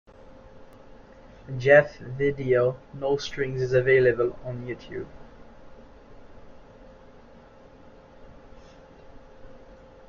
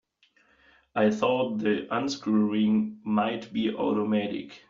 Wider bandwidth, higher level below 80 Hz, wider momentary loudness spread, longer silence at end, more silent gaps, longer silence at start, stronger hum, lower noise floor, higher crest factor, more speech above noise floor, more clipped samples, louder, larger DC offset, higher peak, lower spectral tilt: about the same, 7 kHz vs 7.6 kHz; first, -52 dBFS vs -68 dBFS; first, 18 LU vs 6 LU; first, 0.5 s vs 0.1 s; neither; second, 0.3 s vs 0.95 s; neither; second, -50 dBFS vs -65 dBFS; first, 24 dB vs 16 dB; second, 26 dB vs 39 dB; neither; first, -24 LUFS vs -27 LUFS; neither; first, -4 dBFS vs -10 dBFS; first, -6.5 dB/octave vs -5 dB/octave